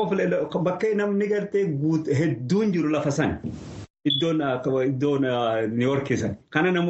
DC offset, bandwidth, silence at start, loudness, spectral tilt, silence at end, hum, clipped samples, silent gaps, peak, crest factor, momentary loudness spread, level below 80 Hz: under 0.1%; 8.4 kHz; 0 s; -24 LUFS; -6.5 dB/octave; 0 s; none; under 0.1%; 3.90-3.94 s; -6 dBFS; 16 dB; 4 LU; -56 dBFS